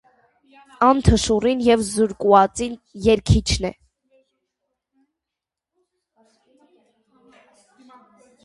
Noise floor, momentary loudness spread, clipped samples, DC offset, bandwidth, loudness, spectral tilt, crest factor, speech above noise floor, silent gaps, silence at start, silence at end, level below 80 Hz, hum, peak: -86 dBFS; 9 LU; under 0.1%; under 0.1%; 11.5 kHz; -18 LUFS; -5.5 dB/octave; 22 dB; 68 dB; none; 0.8 s; 4.75 s; -34 dBFS; none; 0 dBFS